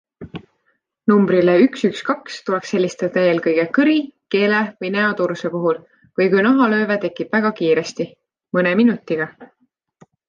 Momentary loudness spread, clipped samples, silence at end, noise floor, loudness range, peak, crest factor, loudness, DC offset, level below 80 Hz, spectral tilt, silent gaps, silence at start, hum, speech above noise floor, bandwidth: 12 LU; under 0.1%; 0.85 s; -68 dBFS; 1 LU; -2 dBFS; 16 dB; -18 LUFS; under 0.1%; -64 dBFS; -6.5 dB/octave; none; 0.2 s; none; 50 dB; 9 kHz